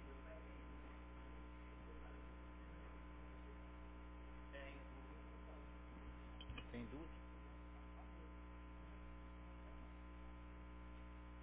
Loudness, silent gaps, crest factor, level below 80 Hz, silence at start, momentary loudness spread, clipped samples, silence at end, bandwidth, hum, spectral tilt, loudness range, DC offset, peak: -58 LUFS; none; 18 dB; -58 dBFS; 0 s; 4 LU; under 0.1%; 0 s; 4 kHz; 60 Hz at -55 dBFS; -5.5 dB/octave; 2 LU; under 0.1%; -38 dBFS